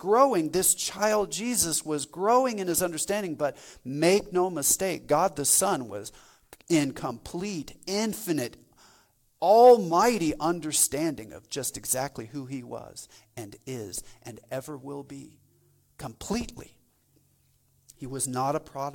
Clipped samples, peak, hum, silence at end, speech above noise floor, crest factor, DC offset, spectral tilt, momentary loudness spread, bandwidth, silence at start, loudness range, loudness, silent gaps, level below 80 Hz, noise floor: under 0.1%; -6 dBFS; none; 0 s; 40 dB; 20 dB; under 0.1%; -3.5 dB/octave; 19 LU; 18.5 kHz; 0 s; 16 LU; -25 LUFS; none; -58 dBFS; -66 dBFS